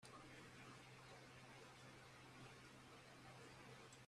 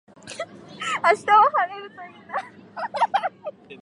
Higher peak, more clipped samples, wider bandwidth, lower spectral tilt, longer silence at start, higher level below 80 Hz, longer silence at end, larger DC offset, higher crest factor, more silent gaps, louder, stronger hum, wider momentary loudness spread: second, -48 dBFS vs -4 dBFS; neither; first, 13.5 kHz vs 11.5 kHz; first, -4 dB/octave vs -2.5 dB/octave; second, 0 s vs 0.25 s; second, -80 dBFS vs -72 dBFS; about the same, 0 s vs 0.05 s; neither; second, 14 dB vs 20 dB; neither; second, -61 LUFS vs -22 LUFS; neither; second, 2 LU vs 23 LU